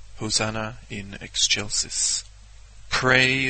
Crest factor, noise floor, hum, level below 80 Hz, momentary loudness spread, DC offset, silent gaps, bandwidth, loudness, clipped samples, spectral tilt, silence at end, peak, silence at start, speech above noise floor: 22 dB; -45 dBFS; none; -44 dBFS; 16 LU; under 0.1%; none; 8.8 kHz; -22 LUFS; under 0.1%; -2 dB/octave; 0 s; -4 dBFS; 0 s; 21 dB